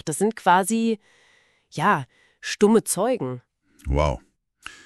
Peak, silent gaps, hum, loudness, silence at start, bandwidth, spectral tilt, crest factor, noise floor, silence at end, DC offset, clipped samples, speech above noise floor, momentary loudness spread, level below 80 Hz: -4 dBFS; none; none; -22 LUFS; 0.05 s; 13.5 kHz; -5 dB/octave; 20 dB; -60 dBFS; 0.15 s; under 0.1%; under 0.1%; 39 dB; 20 LU; -38 dBFS